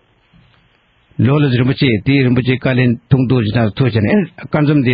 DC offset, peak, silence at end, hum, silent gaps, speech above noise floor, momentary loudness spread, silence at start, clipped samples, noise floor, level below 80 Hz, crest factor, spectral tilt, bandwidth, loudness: under 0.1%; 0 dBFS; 0 s; none; none; 42 dB; 4 LU; 1.2 s; under 0.1%; -55 dBFS; -44 dBFS; 14 dB; -6.5 dB/octave; 5.2 kHz; -14 LUFS